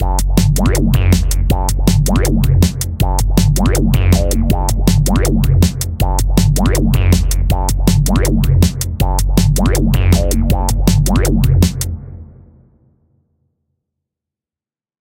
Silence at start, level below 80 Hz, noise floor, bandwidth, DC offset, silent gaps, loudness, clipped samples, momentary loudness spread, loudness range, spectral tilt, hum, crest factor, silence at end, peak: 0 s; -16 dBFS; under -90 dBFS; 17 kHz; under 0.1%; none; -14 LUFS; under 0.1%; 4 LU; 3 LU; -5.5 dB/octave; none; 12 dB; 2.75 s; 0 dBFS